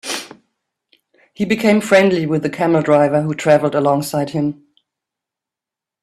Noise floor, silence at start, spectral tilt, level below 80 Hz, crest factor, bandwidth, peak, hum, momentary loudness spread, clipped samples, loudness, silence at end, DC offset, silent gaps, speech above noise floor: -87 dBFS; 0.05 s; -6 dB/octave; -58 dBFS; 18 dB; 14 kHz; 0 dBFS; none; 10 LU; under 0.1%; -16 LUFS; 1.5 s; under 0.1%; none; 72 dB